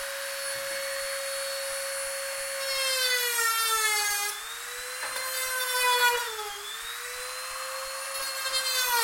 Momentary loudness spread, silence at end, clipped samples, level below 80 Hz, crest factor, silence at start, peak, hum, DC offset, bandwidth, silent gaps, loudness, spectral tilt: 11 LU; 0 s; under 0.1%; -66 dBFS; 18 dB; 0 s; -12 dBFS; none; under 0.1%; 16.5 kHz; none; -28 LUFS; 3 dB/octave